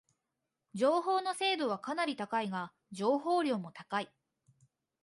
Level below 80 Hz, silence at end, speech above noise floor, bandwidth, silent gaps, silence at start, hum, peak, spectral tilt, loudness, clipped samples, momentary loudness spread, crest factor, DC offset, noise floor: -84 dBFS; 0.95 s; 54 dB; 11.5 kHz; none; 0.75 s; none; -18 dBFS; -4.5 dB/octave; -33 LUFS; under 0.1%; 9 LU; 18 dB; under 0.1%; -87 dBFS